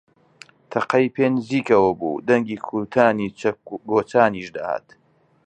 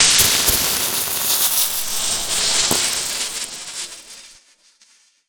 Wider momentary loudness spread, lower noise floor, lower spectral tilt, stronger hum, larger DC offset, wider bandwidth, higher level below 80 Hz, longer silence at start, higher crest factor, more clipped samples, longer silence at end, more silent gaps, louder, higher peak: second, 11 LU vs 15 LU; second, -50 dBFS vs -55 dBFS; first, -7 dB/octave vs 0.5 dB/octave; neither; neither; second, 9 kHz vs over 20 kHz; second, -60 dBFS vs -44 dBFS; first, 0.7 s vs 0 s; about the same, 20 dB vs 20 dB; neither; second, 0.65 s vs 0.95 s; neither; second, -21 LUFS vs -16 LUFS; about the same, -2 dBFS vs 0 dBFS